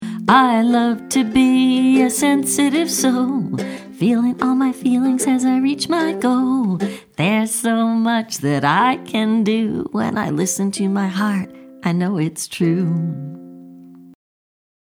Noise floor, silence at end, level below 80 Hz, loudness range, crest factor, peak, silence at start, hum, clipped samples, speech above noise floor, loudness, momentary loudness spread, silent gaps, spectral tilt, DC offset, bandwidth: -40 dBFS; 0.85 s; -58 dBFS; 5 LU; 16 dB; 0 dBFS; 0 s; none; under 0.1%; 24 dB; -17 LUFS; 8 LU; none; -5 dB/octave; under 0.1%; 19 kHz